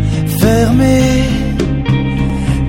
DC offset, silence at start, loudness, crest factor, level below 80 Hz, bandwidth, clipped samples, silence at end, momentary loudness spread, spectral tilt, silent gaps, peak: under 0.1%; 0 s; -13 LUFS; 12 dB; -20 dBFS; 16.5 kHz; under 0.1%; 0 s; 6 LU; -6.5 dB/octave; none; 0 dBFS